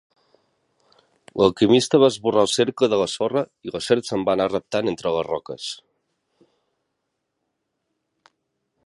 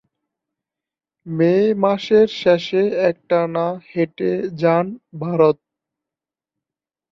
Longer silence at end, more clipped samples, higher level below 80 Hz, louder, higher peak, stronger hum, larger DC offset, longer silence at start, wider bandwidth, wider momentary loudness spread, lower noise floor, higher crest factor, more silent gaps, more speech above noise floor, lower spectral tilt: first, 3.1 s vs 1.55 s; neither; about the same, -58 dBFS vs -62 dBFS; second, -21 LUFS vs -18 LUFS; about the same, -2 dBFS vs -2 dBFS; neither; neither; about the same, 1.35 s vs 1.25 s; first, 11.5 kHz vs 7.2 kHz; first, 14 LU vs 8 LU; second, -77 dBFS vs -89 dBFS; about the same, 20 dB vs 18 dB; neither; second, 57 dB vs 71 dB; second, -4.5 dB/octave vs -7.5 dB/octave